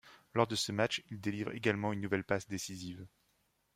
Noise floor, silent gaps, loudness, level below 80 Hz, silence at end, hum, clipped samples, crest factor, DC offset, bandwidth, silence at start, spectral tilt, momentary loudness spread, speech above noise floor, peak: -77 dBFS; none; -36 LUFS; -70 dBFS; 0.7 s; none; under 0.1%; 24 dB; under 0.1%; 16 kHz; 0.05 s; -4.5 dB/octave; 10 LU; 41 dB; -14 dBFS